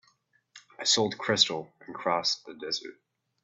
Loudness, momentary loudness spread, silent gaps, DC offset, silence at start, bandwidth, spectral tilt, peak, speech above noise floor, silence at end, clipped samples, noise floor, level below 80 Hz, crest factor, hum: -27 LUFS; 13 LU; none; under 0.1%; 0.55 s; 8.4 kHz; -2 dB/octave; -6 dBFS; 40 dB; 0.5 s; under 0.1%; -69 dBFS; -74 dBFS; 24 dB; none